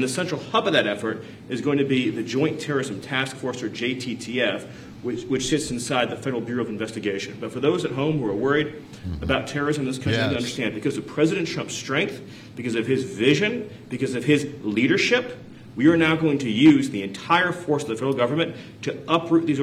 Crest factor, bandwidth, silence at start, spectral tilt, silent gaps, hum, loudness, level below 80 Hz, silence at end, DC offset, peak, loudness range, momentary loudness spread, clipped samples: 18 dB; 13.5 kHz; 0 s; -5 dB/octave; none; none; -23 LUFS; -54 dBFS; 0 s; under 0.1%; -6 dBFS; 6 LU; 12 LU; under 0.1%